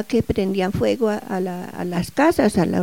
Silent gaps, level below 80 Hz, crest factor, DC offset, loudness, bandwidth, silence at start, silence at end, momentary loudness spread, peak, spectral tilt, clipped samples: none; -44 dBFS; 16 dB; 0.4%; -21 LUFS; 17 kHz; 0 s; 0 s; 9 LU; -4 dBFS; -6.5 dB/octave; under 0.1%